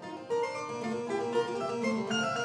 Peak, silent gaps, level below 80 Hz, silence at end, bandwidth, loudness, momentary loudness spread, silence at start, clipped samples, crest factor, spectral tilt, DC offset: -18 dBFS; none; -80 dBFS; 0 s; 11 kHz; -33 LUFS; 5 LU; 0 s; under 0.1%; 14 dB; -4.5 dB/octave; under 0.1%